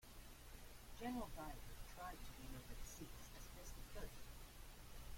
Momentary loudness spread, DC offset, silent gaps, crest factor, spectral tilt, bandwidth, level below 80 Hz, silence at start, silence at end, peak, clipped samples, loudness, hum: 11 LU; under 0.1%; none; 16 dB; -4 dB/octave; 16.5 kHz; -58 dBFS; 0 s; 0 s; -36 dBFS; under 0.1%; -56 LUFS; none